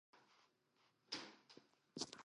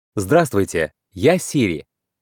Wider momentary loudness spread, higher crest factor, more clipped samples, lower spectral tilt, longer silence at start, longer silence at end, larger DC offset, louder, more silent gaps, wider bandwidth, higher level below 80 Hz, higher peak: first, 16 LU vs 8 LU; first, 30 dB vs 16 dB; neither; second, -2 dB/octave vs -5.5 dB/octave; about the same, 0.15 s vs 0.15 s; second, 0 s vs 0.4 s; neither; second, -52 LUFS vs -19 LUFS; neither; second, 11 kHz vs 18.5 kHz; second, under -90 dBFS vs -54 dBFS; second, -26 dBFS vs -2 dBFS